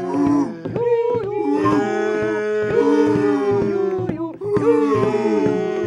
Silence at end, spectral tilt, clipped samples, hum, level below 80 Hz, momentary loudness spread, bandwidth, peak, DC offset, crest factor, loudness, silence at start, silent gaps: 0 s; -7.5 dB/octave; under 0.1%; none; -52 dBFS; 6 LU; 10.5 kHz; -4 dBFS; under 0.1%; 14 dB; -19 LUFS; 0 s; none